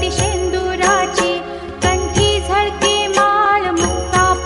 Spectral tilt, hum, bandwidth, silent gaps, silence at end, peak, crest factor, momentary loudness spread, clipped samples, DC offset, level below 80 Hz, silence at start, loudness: -3.5 dB/octave; none; 11.5 kHz; none; 0 s; -2 dBFS; 14 dB; 5 LU; under 0.1%; under 0.1%; -28 dBFS; 0 s; -15 LUFS